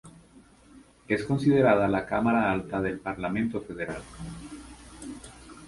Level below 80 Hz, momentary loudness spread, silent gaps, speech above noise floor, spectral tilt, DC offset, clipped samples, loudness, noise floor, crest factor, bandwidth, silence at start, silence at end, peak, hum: -52 dBFS; 22 LU; none; 29 dB; -7 dB/octave; under 0.1%; under 0.1%; -26 LUFS; -55 dBFS; 20 dB; 11.5 kHz; 0.05 s; 0 s; -8 dBFS; none